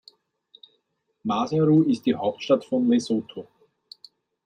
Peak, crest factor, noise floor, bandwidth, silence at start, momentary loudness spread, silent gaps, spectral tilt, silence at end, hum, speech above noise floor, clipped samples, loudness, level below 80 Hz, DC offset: -8 dBFS; 18 dB; -73 dBFS; 9.8 kHz; 1.25 s; 13 LU; none; -7 dB/octave; 1 s; none; 51 dB; under 0.1%; -23 LUFS; -70 dBFS; under 0.1%